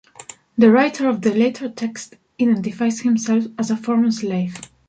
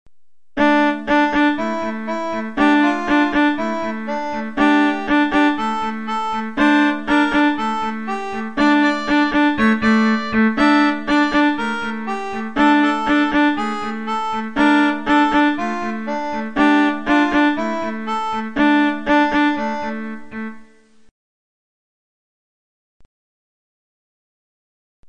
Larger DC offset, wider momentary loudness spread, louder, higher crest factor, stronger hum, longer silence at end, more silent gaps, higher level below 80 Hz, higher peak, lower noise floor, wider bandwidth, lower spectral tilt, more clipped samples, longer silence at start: second, under 0.1% vs 1%; first, 14 LU vs 9 LU; about the same, -19 LUFS vs -17 LUFS; about the same, 16 dB vs 16 dB; neither; first, 0.25 s vs 0 s; second, none vs 21.11-25.03 s; second, -64 dBFS vs -48 dBFS; about the same, -2 dBFS vs -2 dBFS; second, -42 dBFS vs -60 dBFS; about the same, 9.2 kHz vs 9.2 kHz; about the same, -5.5 dB/octave vs -5 dB/octave; neither; first, 0.2 s vs 0.05 s